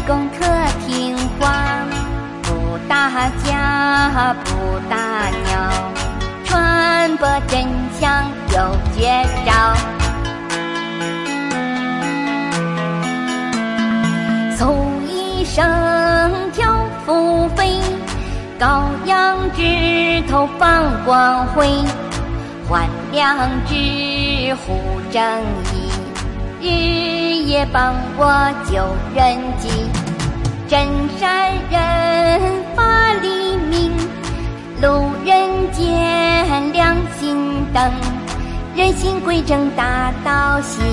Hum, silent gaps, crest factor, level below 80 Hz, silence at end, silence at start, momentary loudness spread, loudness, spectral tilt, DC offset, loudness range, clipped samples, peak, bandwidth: none; none; 14 dB; -26 dBFS; 0 s; 0 s; 8 LU; -17 LUFS; -5 dB/octave; under 0.1%; 3 LU; under 0.1%; -2 dBFS; 11.5 kHz